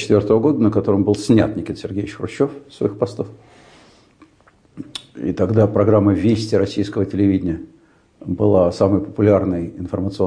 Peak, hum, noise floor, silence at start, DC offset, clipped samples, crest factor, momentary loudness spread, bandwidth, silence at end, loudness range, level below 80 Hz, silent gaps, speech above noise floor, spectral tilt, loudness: -4 dBFS; none; -54 dBFS; 0 s; under 0.1%; under 0.1%; 14 dB; 13 LU; 10.5 kHz; 0 s; 8 LU; -48 dBFS; none; 37 dB; -8 dB/octave; -18 LUFS